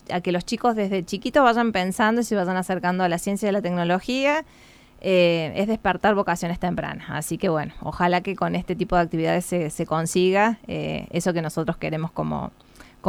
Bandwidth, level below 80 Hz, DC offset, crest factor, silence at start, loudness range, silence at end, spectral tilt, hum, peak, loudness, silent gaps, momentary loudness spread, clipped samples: 15.5 kHz; -48 dBFS; under 0.1%; 18 dB; 0.1 s; 2 LU; 0 s; -5.5 dB/octave; none; -4 dBFS; -23 LUFS; none; 9 LU; under 0.1%